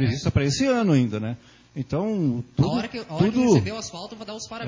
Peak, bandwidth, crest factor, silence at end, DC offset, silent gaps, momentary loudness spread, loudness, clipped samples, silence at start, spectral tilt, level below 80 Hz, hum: -6 dBFS; 7.6 kHz; 16 dB; 0 s; under 0.1%; none; 15 LU; -23 LUFS; under 0.1%; 0 s; -6.5 dB/octave; -44 dBFS; none